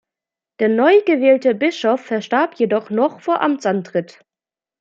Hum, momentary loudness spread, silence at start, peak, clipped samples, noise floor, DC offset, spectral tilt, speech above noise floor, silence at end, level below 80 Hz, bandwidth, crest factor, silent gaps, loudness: none; 8 LU; 0.6 s; -2 dBFS; under 0.1%; -90 dBFS; under 0.1%; -6 dB/octave; 73 dB; 0.75 s; -72 dBFS; 7.6 kHz; 16 dB; none; -17 LUFS